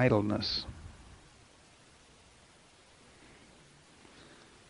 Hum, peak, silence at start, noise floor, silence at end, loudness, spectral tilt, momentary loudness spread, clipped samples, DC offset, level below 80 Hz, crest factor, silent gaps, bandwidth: none; -10 dBFS; 0 s; -60 dBFS; 3.7 s; -32 LUFS; -6 dB/octave; 27 LU; under 0.1%; under 0.1%; -58 dBFS; 26 dB; none; 10.5 kHz